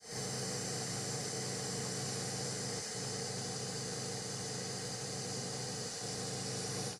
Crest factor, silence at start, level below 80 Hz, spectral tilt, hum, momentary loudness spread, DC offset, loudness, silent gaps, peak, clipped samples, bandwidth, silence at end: 14 dB; 0 s; -68 dBFS; -3 dB/octave; none; 2 LU; under 0.1%; -39 LUFS; none; -26 dBFS; under 0.1%; 15.5 kHz; 0 s